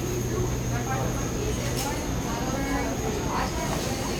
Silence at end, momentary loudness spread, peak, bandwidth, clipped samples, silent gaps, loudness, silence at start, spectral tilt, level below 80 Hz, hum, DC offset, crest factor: 0 s; 1 LU; -14 dBFS; over 20 kHz; under 0.1%; none; -28 LUFS; 0 s; -4.5 dB/octave; -36 dBFS; none; under 0.1%; 12 dB